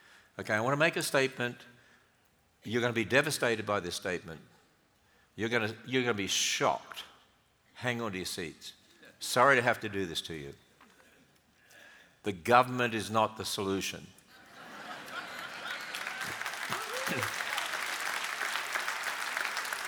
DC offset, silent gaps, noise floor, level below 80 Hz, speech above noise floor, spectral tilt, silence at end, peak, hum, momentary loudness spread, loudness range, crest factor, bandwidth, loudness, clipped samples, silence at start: under 0.1%; none; -69 dBFS; -70 dBFS; 37 dB; -3 dB/octave; 0 s; -8 dBFS; none; 17 LU; 4 LU; 26 dB; over 20 kHz; -32 LUFS; under 0.1%; 0.35 s